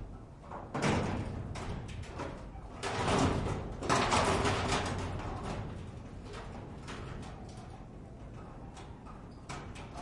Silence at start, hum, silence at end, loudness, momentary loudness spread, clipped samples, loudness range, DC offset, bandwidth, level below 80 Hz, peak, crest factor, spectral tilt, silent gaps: 0 s; none; 0 s; -35 LUFS; 19 LU; under 0.1%; 14 LU; under 0.1%; 11.5 kHz; -48 dBFS; -14 dBFS; 22 dB; -5 dB/octave; none